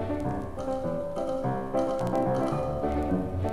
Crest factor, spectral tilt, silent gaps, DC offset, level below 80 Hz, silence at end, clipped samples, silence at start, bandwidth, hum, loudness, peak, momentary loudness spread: 14 dB; -8 dB/octave; none; under 0.1%; -42 dBFS; 0 s; under 0.1%; 0 s; 13.5 kHz; none; -30 LUFS; -16 dBFS; 5 LU